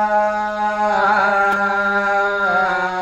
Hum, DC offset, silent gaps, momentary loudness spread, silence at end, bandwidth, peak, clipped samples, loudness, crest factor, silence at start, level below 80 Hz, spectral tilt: none; under 0.1%; none; 4 LU; 0 s; 10 kHz; -4 dBFS; under 0.1%; -17 LUFS; 14 dB; 0 s; -50 dBFS; -4.5 dB/octave